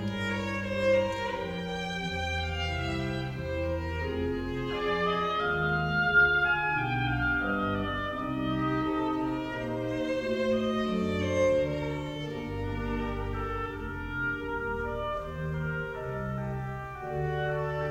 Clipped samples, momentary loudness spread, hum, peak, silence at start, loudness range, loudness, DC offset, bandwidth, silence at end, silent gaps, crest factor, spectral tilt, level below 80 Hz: under 0.1%; 8 LU; none; -12 dBFS; 0 s; 7 LU; -30 LUFS; under 0.1%; 16 kHz; 0 s; none; 18 dB; -6.5 dB/octave; -44 dBFS